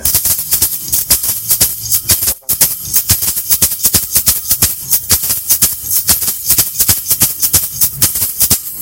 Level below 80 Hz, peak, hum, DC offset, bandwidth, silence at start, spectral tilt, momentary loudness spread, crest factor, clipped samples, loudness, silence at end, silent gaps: -34 dBFS; 0 dBFS; none; under 0.1%; over 20 kHz; 0 s; -0.5 dB/octave; 2 LU; 14 dB; 0.5%; -10 LUFS; 0 s; none